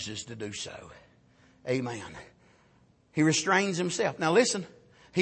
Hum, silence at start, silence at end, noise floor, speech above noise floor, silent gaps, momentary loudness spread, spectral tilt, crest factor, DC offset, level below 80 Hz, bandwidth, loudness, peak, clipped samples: none; 0 s; 0 s; -63 dBFS; 35 dB; none; 20 LU; -4 dB/octave; 20 dB; under 0.1%; -66 dBFS; 8.8 kHz; -28 LUFS; -10 dBFS; under 0.1%